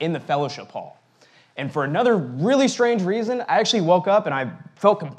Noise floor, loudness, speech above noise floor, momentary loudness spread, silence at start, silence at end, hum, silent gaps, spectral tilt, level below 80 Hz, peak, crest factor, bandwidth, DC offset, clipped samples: -55 dBFS; -21 LUFS; 35 dB; 14 LU; 0 s; 0 s; none; none; -5 dB/octave; -86 dBFS; -2 dBFS; 18 dB; 10.5 kHz; under 0.1%; under 0.1%